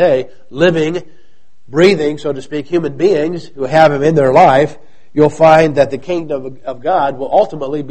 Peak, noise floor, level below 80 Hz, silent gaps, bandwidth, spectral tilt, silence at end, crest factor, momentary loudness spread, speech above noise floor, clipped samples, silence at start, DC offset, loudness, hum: 0 dBFS; -56 dBFS; -46 dBFS; none; 8.8 kHz; -6.5 dB/octave; 0 s; 12 dB; 14 LU; 44 dB; 0.3%; 0 s; 3%; -13 LUFS; none